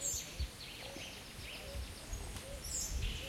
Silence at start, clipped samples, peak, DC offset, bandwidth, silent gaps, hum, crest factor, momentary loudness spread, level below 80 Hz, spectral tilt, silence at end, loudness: 0 s; under 0.1%; -26 dBFS; under 0.1%; 16.5 kHz; none; none; 16 dB; 8 LU; -46 dBFS; -2 dB/octave; 0 s; -43 LUFS